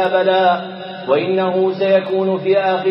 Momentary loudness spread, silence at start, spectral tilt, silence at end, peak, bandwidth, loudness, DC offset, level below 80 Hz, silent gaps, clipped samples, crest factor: 6 LU; 0 s; -8.5 dB/octave; 0 s; -2 dBFS; 5.8 kHz; -16 LUFS; under 0.1%; -76 dBFS; none; under 0.1%; 14 dB